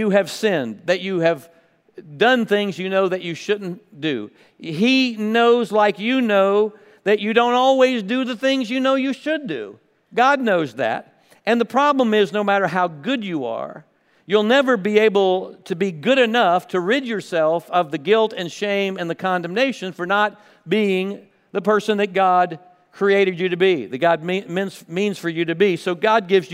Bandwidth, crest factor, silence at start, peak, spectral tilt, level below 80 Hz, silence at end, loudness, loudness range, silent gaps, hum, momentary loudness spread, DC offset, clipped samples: 15.5 kHz; 18 dB; 0 s; -2 dBFS; -5.5 dB/octave; -78 dBFS; 0 s; -19 LUFS; 3 LU; none; none; 10 LU; under 0.1%; under 0.1%